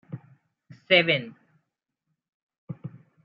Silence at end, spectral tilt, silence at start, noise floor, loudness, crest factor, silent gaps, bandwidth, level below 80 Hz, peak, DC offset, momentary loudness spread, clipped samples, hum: 0.35 s; -7 dB/octave; 0.1 s; -82 dBFS; -21 LUFS; 26 dB; 2.29-2.47 s, 2.58-2.67 s; 5.8 kHz; -76 dBFS; -4 dBFS; under 0.1%; 24 LU; under 0.1%; none